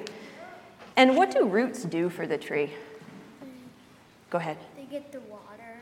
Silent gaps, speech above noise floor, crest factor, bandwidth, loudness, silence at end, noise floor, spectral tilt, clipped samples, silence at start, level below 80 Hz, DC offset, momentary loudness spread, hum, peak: none; 28 dB; 24 dB; 15.5 kHz; -26 LUFS; 0 s; -55 dBFS; -5 dB/octave; under 0.1%; 0 s; -76 dBFS; under 0.1%; 25 LU; none; -4 dBFS